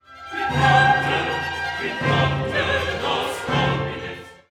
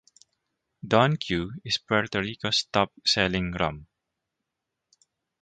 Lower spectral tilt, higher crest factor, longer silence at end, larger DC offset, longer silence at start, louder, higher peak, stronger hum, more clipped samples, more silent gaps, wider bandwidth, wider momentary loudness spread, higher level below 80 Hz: about the same, -5 dB/octave vs -4.5 dB/octave; second, 18 dB vs 24 dB; second, 0.15 s vs 1.55 s; neither; second, 0.1 s vs 0.85 s; first, -21 LUFS vs -25 LUFS; about the same, -4 dBFS vs -4 dBFS; neither; neither; neither; first, 14 kHz vs 9.4 kHz; first, 13 LU vs 8 LU; first, -44 dBFS vs -52 dBFS